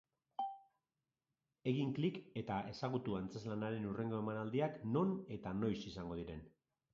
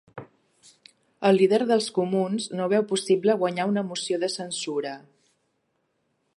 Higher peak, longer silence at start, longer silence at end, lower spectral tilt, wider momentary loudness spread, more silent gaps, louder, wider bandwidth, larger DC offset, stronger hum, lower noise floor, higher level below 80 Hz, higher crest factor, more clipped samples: second, -24 dBFS vs -8 dBFS; first, 0.4 s vs 0.15 s; second, 0.45 s vs 1.4 s; first, -6.5 dB/octave vs -5 dB/octave; about the same, 9 LU vs 11 LU; neither; second, -42 LUFS vs -24 LUFS; second, 7.4 kHz vs 11.5 kHz; neither; neither; first, under -90 dBFS vs -73 dBFS; first, -68 dBFS vs -78 dBFS; about the same, 18 dB vs 18 dB; neither